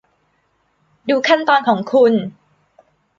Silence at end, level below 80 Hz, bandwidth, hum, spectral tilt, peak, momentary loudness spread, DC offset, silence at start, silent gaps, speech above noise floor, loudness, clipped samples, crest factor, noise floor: 0.85 s; -66 dBFS; 7.4 kHz; none; -5.5 dB/octave; -2 dBFS; 12 LU; under 0.1%; 1.05 s; none; 49 dB; -15 LUFS; under 0.1%; 16 dB; -63 dBFS